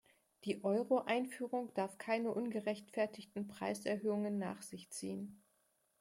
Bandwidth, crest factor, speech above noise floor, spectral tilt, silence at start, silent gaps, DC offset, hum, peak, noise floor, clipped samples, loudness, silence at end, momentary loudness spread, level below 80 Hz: 16 kHz; 18 dB; 39 dB; -5.5 dB/octave; 0.45 s; none; under 0.1%; none; -22 dBFS; -79 dBFS; under 0.1%; -40 LUFS; 0.65 s; 11 LU; -86 dBFS